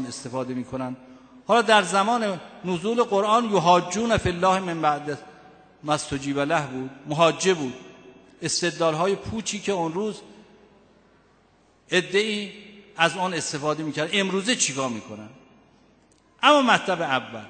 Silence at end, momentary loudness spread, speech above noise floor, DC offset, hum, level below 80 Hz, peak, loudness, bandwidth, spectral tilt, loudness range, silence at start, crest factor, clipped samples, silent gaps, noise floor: 0 s; 15 LU; 36 dB; under 0.1%; none; -54 dBFS; -2 dBFS; -23 LUFS; 9.2 kHz; -3.5 dB/octave; 6 LU; 0 s; 22 dB; under 0.1%; none; -60 dBFS